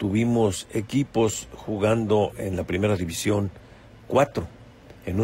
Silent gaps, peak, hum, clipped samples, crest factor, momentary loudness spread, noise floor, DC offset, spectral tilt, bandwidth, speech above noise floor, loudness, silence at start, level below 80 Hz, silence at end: none; -8 dBFS; none; under 0.1%; 16 dB; 11 LU; -47 dBFS; under 0.1%; -6 dB/octave; 16.5 kHz; 23 dB; -25 LUFS; 0 s; -48 dBFS; 0 s